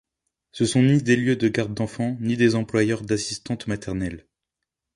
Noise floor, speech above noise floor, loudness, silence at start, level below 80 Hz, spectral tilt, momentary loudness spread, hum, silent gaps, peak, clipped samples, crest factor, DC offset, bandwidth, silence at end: -84 dBFS; 62 dB; -23 LUFS; 0.55 s; -50 dBFS; -6 dB/octave; 11 LU; none; none; -6 dBFS; under 0.1%; 18 dB; under 0.1%; 11.5 kHz; 0.75 s